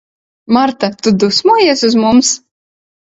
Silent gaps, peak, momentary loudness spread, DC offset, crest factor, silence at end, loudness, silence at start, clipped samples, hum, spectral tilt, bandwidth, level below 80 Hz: none; 0 dBFS; 6 LU; under 0.1%; 12 dB; 0.7 s; -11 LUFS; 0.5 s; under 0.1%; none; -3.5 dB/octave; 8 kHz; -52 dBFS